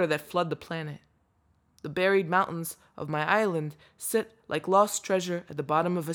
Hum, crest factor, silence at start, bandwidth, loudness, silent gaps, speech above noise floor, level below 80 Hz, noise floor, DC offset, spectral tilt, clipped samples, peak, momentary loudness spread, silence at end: none; 20 dB; 0 s; over 20 kHz; -28 LUFS; none; 40 dB; -70 dBFS; -69 dBFS; under 0.1%; -4.5 dB/octave; under 0.1%; -8 dBFS; 14 LU; 0 s